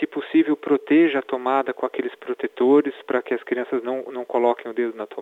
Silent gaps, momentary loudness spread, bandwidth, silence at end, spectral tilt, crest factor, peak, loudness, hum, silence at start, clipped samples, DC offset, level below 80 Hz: none; 11 LU; 4.1 kHz; 0 s; -7 dB/octave; 16 dB; -6 dBFS; -22 LUFS; none; 0 s; under 0.1%; under 0.1%; -80 dBFS